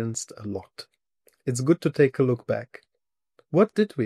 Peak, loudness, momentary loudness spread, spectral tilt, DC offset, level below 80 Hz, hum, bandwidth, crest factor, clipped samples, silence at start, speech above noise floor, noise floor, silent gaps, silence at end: -8 dBFS; -25 LUFS; 16 LU; -6.5 dB/octave; under 0.1%; -68 dBFS; none; 13.5 kHz; 18 dB; under 0.1%; 0 s; 59 dB; -84 dBFS; none; 0 s